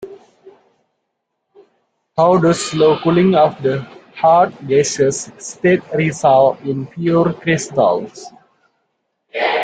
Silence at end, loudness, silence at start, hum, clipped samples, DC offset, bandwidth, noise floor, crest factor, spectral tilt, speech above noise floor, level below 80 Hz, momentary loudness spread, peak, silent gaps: 0 s; -15 LUFS; 0 s; none; under 0.1%; under 0.1%; 9.4 kHz; -73 dBFS; 16 dB; -5.5 dB/octave; 59 dB; -56 dBFS; 13 LU; -2 dBFS; none